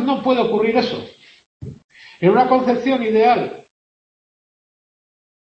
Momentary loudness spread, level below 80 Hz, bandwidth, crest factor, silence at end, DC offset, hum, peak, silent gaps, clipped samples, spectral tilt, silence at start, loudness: 22 LU; -58 dBFS; 7.8 kHz; 18 dB; 1.95 s; under 0.1%; none; -2 dBFS; 1.46-1.60 s, 1.84-1.89 s; under 0.1%; -7 dB/octave; 0 s; -17 LUFS